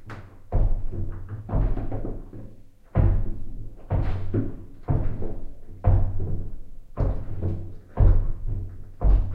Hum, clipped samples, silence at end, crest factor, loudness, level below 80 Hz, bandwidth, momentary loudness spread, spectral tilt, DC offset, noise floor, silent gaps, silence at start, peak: none; under 0.1%; 0 s; 16 dB; -28 LUFS; -26 dBFS; 3 kHz; 18 LU; -11 dB/octave; under 0.1%; -43 dBFS; none; 0 s; -6 dBFS